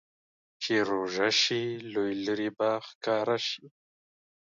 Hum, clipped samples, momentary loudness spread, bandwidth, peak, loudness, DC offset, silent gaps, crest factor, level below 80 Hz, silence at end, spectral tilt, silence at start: none; under 0.1%; 9 LU; 7.8 kHz; -12 dBFS; -29 LUFS; under 0.1%; 2.95-3.01 s; 20 dB; -74 dBFS; 0.8 s; -3.5 dB/octave; 0.6 s